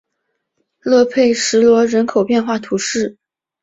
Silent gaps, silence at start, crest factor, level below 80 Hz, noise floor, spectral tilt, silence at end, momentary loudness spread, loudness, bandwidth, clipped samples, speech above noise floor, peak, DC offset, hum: none; 0.85 s; 14 dB; -58 dBFS; -73 dBFS; -3.5 dB/octave; 0.5 s; 9 LU; -15 LUFS; 8 kHz; under 0.1%; 59 dB; -2 dBFS; under 0.1%; none